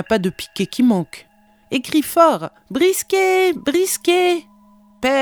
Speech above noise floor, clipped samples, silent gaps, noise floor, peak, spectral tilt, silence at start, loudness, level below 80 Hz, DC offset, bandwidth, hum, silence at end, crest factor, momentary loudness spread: 33 dB; under 0.1%; none; -50 dBFS; 0 dBFS; -4 dB/octave; 0 s; -18 LUFS; -56 dBFS; under 0.1%; over 20 kHz; none; 0 s; 18 dB; 10 LU